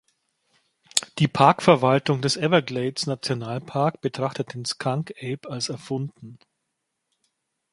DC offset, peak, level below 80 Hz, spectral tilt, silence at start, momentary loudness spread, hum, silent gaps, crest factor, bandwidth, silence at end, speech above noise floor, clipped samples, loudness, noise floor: under 0.1%; 0 dBFS; -64 dBFS; -5 dB/octave; 0.95 s; 13 LU; none; none; 24 dB; 13 kHz; 1.4 s; 56 dB; under 0.1%; -23 LUFS; -79 dBFS